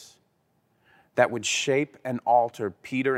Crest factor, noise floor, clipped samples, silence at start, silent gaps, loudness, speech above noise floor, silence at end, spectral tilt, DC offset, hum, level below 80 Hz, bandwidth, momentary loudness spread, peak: 22 dB; -70 dBFS; under 0.1%; 0 s; none; -25 LUFS; 45 dB; 0 s; -3.5 dB/octave; under 0.1%; none; -76 dBFS; 15.5 kHz; 9 LU; -4 dBFS